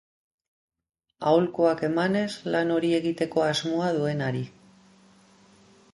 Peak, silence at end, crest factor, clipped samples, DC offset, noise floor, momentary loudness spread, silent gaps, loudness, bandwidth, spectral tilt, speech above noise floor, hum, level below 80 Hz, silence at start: -8 dBFS; 1.45 s; 18 dB; under 0.1%; under 0.1%; -57 dBFS; 7 LU; none; -25 LUFS; 11.5 kHz; -6 dB/octave; 32 dB; none; -66 dBFS; 1.2 s